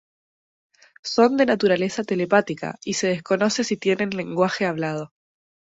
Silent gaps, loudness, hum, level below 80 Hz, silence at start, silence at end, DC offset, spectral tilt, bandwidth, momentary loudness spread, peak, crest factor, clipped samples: none; -22 LUFS; none; -64 dBFS; 1.05 s; 0.7 s; under 0.1%; -4.5 dB/octave; 8 kHz; 11 LU; -4 dBFS; 20 dB; under 0.1%